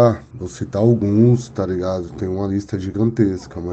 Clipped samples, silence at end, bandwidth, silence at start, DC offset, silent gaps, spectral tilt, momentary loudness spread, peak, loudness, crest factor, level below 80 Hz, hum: under 0.1%; 0 s; 8.2 kHz; 0 s; under 0.1%; none; -8.5 dB/octave; 12 LU; -2 dBFS; -19 LUFS; 16 dB; -46 dBFS; none